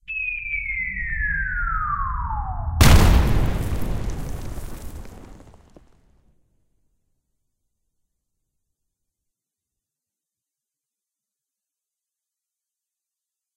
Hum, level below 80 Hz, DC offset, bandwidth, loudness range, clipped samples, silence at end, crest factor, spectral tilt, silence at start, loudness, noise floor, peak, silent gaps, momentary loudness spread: none; -28 dBFS; under 0.1%; 16 kHz; 18 LU; under 0.1%; 7.2 s; 24 dB; -5 dB/octave; 0.1 s; -22 LUFS; -87 dBFS; 0 dBFS; none; 21 LU